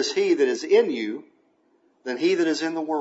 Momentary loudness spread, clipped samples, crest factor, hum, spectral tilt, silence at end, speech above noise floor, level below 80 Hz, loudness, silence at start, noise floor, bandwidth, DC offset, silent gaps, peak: 13 LU; under 0.1%; 16 dB; none; -3.5 dB/octave; 0 s; 41 dB; -86 dBFS; -23 LUFS; 0 s; -64 dBFS; 8 kHz; under 0.1%; none; -8 dBFS